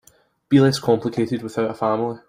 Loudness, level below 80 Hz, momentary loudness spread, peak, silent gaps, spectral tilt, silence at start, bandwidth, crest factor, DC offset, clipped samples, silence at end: -20 LUFS; -58 dBFS; 8 LU; -4 dBFS; none; -6.5 dB/octave; 0.5 s; 15.5 kHz; 18 dB; under 0.1%; under 0.1%; 0.1 s